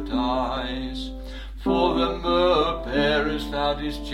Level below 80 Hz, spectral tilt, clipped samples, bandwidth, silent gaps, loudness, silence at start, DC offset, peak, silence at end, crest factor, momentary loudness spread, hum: -36 dBFS; -6 dB/octave; under 0.1%; 15 kHz; none; -24 LUFS; 0 s; under 0.1%; -8 dBFS; 0 s; 16 dB; 12 LU; none